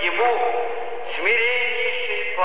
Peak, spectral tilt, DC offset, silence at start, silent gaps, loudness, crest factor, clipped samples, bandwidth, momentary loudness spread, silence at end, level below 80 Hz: -8 dBFS; -5 dB/octave; 4%; 0 s; none; -21 LUFS; 14 dB; under 0.1%; 4 kHz; 10 LU; 0 s; -70 dBFS